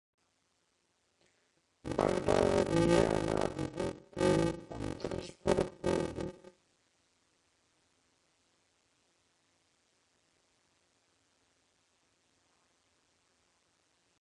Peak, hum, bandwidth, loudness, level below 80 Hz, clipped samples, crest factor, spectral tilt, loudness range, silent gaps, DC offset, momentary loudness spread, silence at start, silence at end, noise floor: -14 dBFS; none; 11.5 kHz; -33 LUFS; -56 dBFS; under 0.1%; 24 dB; -6 dB/octave; 10 LU; none; under 0.1%; 13 LU; 1.85 s; 7.9 s; -77 dBFS